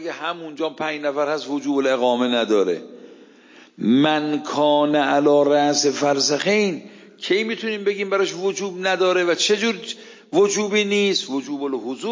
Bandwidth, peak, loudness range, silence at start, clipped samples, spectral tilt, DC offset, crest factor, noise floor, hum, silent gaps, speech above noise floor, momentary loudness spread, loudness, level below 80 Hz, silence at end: 7.6 kHz; -4 dBFS; 4 LU; 0 s; under 0.1%; -3.5 dB/octave; under 0.1%; 16 dB; -48 dBFS; none; none; 28 dB; 10 LU; -20 LUFS; -76 dBFS; 0 s